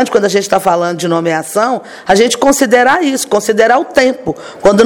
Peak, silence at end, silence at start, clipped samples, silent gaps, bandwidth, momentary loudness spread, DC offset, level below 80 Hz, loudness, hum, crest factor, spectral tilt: 0 dBFS; 0 s; 0 s; 0.5%; none; 18 kHz; 6 LU; under 0.1%; -44 dBFS; -11 LUFS; none; 10 dB; -3.5 dB/octave